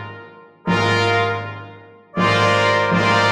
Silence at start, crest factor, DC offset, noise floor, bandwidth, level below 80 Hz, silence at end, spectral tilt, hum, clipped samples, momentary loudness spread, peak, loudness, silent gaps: 0 s; 14 dB; under 0.1%; -41 dBFS; 11 kHz; -52 dBFS; 0 s; -5 dB/octave; none; under 0.1%; 18 LU; -4 dBFS; -17 LUFS; none